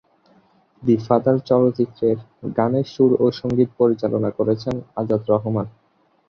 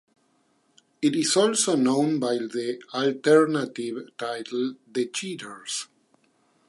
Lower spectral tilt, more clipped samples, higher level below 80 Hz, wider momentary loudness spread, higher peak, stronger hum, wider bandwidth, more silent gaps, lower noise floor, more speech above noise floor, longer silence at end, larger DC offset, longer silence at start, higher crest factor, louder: first, -9 dB/octave vs -3.5 dB/octave; neither; first, -56 dBFS vs -80 dBFS; second, 9 LU vs 13 LU; first, -2 dBFS vs -6 dBFS; neither; second, 6.6 kHz vs 11.5 kHz; neither; second, -57 dBFS vs -67 dBFS; second, 38 dB vs 42 dB; second, 0.6 s vs 0.85 s; neither; second, 0.8 s vs 1 s; about the same, 18 dB vs 20 dB; first, -20 LUFS vs -25 LUFS